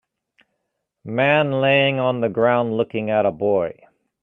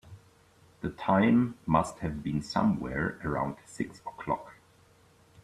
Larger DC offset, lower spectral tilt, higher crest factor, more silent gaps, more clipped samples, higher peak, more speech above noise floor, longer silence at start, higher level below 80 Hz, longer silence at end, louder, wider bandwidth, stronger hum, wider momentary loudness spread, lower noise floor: neither; first, -8.5 dB/octave vs -7 dB/octave; about the same, 18 dB vs 20 dB; neither; neither; first, -2 dBFS vs -10 dBFS; first, 58 dB vs 32 dB; first, 1.05 s vs 0.1 s; second, -64 dBFS vs -54 dBFS; second, 0.5 s vs 0.9 s; first, -19 LUFS vs -30 LUFS; second, 4.1 kHz vs 12 kHz; neither; second, 6 LU vs 13 LU; first, -77 dBFS vs -61 dBFS